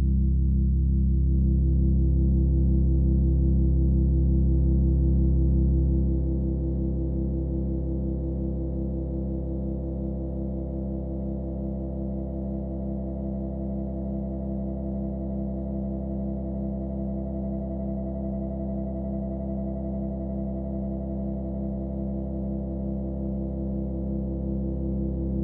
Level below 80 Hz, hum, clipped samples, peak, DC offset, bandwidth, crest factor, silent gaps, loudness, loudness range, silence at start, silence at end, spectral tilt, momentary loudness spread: -28 dBFS; 50 Hz at -40 dBFS; under 0.1%; -12 dBFS; under 0.1%; 1.2 kHz; 12 dB; none; -28 LUFS; 8 LU; 0 s; 0 s; -15 dB/octave; 8 LU